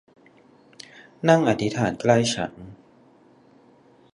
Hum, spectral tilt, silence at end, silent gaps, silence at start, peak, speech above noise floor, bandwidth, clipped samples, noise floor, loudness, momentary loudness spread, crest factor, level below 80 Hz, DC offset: none; -5.5 dB/octave; 1.4 s; none; 1.25 s; -2 dBFS; 34 dB; 11.5 kHz; under 0.1%; -55 dBFS; -22 LUFS; 25 LU; 22 dB; -58 dBFS; under 0.1%